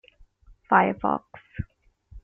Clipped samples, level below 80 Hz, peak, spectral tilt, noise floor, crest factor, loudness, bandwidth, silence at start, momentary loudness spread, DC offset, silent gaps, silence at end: under 0.1%; -50 dBFS; -4 dBFS; -5.5 dB/octave; -54 dBFS; 24 dB; -23 LUFS; 3.6 kHz; 0.7 s; 19 LU; under 0.1%; none; 0.05 s